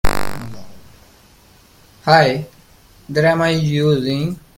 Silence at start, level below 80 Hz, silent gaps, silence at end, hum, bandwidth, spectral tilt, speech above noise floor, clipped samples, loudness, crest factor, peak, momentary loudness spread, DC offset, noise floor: 0.05 s; -34 dBFS; none; 0.2 s; none; 17 kHz; -6 dB/octave; 33 dB; under 0.1%; -17 LUFS; 18 dB; 0 dBFS; 17 LU; under 0.1%; -49 dBFS